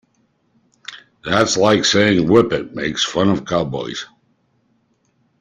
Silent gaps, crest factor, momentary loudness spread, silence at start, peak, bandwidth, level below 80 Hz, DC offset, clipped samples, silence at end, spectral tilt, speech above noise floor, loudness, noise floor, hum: none; 18 dB; 22 LU; 0.9 s; -2 dBFS; 11 kHz; -50 dBFS; under 0.1%; under 0.1%; 1.35 s; -4 dB/octave; 47 dB; -16 LUFS; -63 dBFS; none